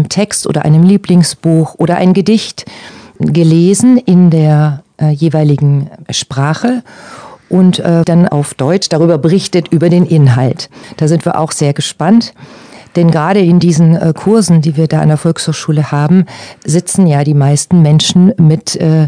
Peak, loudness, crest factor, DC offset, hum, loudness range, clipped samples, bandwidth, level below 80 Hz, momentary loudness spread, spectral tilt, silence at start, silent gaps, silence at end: 0 dBFS; -10 LUFS; 10 dB; under 0.1%; none; 3 LU; 2%; 10 kHz; -48 dBFS; 8 LU; -6.5 dB/octave; 0 s; none; 0 s